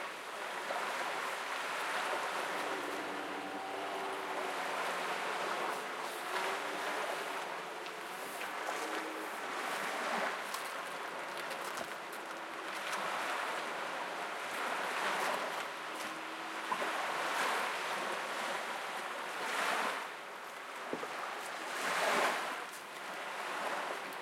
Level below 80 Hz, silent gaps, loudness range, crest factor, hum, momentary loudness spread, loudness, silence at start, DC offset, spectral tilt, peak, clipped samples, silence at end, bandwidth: under -90 dBFS; none; 3 LU; 20 dB; none; 8 LU; -38 LUFS; 0 s; under 0.1%; -1.5 dB/octave; -20 dBFS; under 0.1%; 0 s; 16.5 kHz